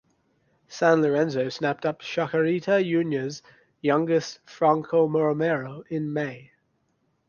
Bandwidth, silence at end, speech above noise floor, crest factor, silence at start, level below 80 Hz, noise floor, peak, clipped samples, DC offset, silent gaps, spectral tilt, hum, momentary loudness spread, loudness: 7.2 kHz; 0.85 s; 47 dB; 20 dB; 0.7 s; -70 dBFS; -71 dBFS; -6 dBFS; under 0.1%; under 0.1%; none; -6.5 dB/octave; none; 11 LU; -25 LUFS